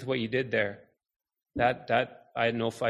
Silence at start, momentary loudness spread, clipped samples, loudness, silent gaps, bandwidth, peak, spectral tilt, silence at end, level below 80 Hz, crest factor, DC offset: 0 s; 6 LU; under 0.1%; -29 LUFS; 1.16-1.20 s; 12.5 kHz; -10 dBFS; -6 dB/octave; 0 s; -60 dBFS; 20 dB; under 0.1%